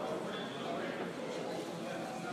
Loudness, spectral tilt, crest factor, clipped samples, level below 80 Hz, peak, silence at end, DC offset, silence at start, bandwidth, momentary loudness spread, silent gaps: -40 LUFS; -5 dB/octave; 14 dB; under 0.1%; -78 dBFS; -26 dBFS; 0 s; under 0.1%; 0 s; 15.5 kHz; 2 LU; none